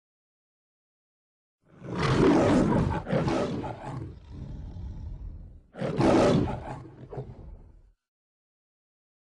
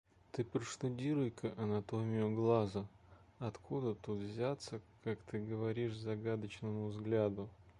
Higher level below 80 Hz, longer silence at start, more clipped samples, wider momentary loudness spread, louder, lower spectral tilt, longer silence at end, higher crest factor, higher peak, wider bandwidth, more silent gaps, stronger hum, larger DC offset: first, -44 dBFS vs -68 dBFS; first, 1.8 s vs 0.35 s; neither; first, 22 LU vs 10 LU; first, -26 LUFS vs -40 LUFS; about the same, -7 dB/octave vs -7 dB/octave; first, 1.55 s vs 0.1 s; about the same, 18 dB vs 20 dB; first, -10 dBFS vs -20 dBFS; about the same, 10.5 kHz vs 11 kHz; neither; neither; neither